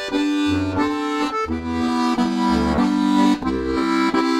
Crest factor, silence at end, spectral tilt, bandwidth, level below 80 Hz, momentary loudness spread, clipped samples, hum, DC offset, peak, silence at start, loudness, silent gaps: 14 dB; 0 s; -5.5 dB/octave; 13 kHz; -38 dBFS; 5 LU; under 0.1%; none; under 0.1%; -6 dBFS; 0 s; -20 LUFS; none